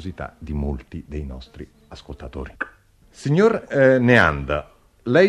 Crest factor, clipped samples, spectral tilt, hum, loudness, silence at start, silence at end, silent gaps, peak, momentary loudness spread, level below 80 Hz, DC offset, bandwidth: 20 dB; under 0.1%; -7 dB/octave; none; -19 LUFS; 0 s; 0 s; none; 0 dBFS; 23 LU; -38 dBFS; under 0.1%; 11 kHz